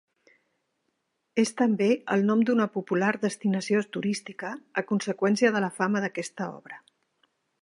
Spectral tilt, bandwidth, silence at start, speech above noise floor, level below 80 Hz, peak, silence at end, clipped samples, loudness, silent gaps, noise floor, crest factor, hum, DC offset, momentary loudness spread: -5.5 dB/octave; 11.5 kHz; 1.35 s; 51 dB; -78 dBFS; -8 dBFS; 0.85 s; under 0.1%; -27 LUFS; none; -77 dBFS; 20 dB; none; under 0.1%; 13 LU